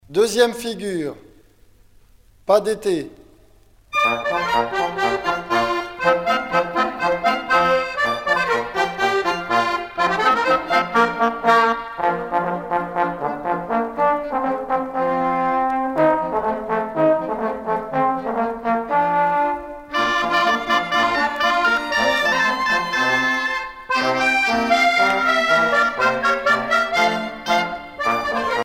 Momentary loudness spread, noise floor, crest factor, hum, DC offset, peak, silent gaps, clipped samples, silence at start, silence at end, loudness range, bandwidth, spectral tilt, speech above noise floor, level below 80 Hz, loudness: 7 LU; -51 dBFS; 18 dB; none; under 0.1%; -2 dBFS; none; under 0.1%; 0.1 s; 0 s; 5 LU; 16.5 kHz; -3.5 dB/octave; 32 dB; -50 dBFS; -19 LUFS